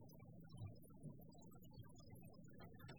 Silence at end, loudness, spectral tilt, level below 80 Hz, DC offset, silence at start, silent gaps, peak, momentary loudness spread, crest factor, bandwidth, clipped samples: 0 s; -61 LUFS; -6.5 dB/octave; -72 dBFS; under 0.1%; 0 s; none; -42 dBFS; 5 LU; 16 dB; over 20 kHz; under 0.1%